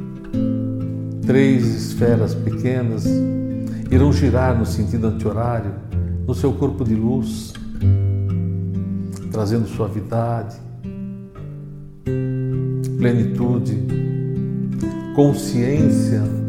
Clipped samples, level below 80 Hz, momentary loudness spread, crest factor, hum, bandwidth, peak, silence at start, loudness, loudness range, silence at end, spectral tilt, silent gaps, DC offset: under 0.1%; -38 dBFS; 11 LU; 16 dB; none; 15 kHz; -2 dBFS; 0 s; -20 LUFS; 6 LU; 0 s; -8 dB/octave; none; under 0.1%